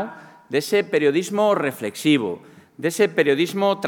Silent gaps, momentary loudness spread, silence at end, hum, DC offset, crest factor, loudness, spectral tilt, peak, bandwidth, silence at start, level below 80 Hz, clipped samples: none; 9 LU; 0 s; none; under 0.1%; 18 dB; -21 LUFS; -4.5 dB/octave; -4 dBFS; 19 kHz; 0 s; -80 dBFS; under 0.1%